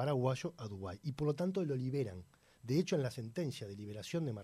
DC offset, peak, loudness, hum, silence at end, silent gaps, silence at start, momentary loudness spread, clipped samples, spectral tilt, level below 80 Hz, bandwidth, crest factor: under 0.1%; -20 dBFS; -39 LUFS; none; 0 s; none; 0 s; 11 LU; under 0.1%; -7 dB/octave; -68 dBFS; 14.5 kHz; 18 dB